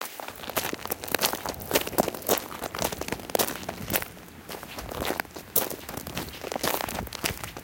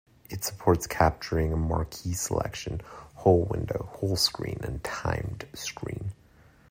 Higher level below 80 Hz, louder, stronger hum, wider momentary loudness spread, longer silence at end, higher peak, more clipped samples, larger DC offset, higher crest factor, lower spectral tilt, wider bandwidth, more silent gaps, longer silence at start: second, -50 dBFS vs -44 dBFS; about the same, -29 LUFS vs -29 LUFS; neither; about the same, 11 LU vs 13 LU; second, 0 s vs 0.55 s; first, -2 dBFS vs -6 dBFS; neither; neither; first, 28 dB vs 22 dB; second, -2.5 dB/octave vs -5 dB/octave; about the same, 17.5 kHz vs 16 kHz; neither; second, 0 s vs 0.3 s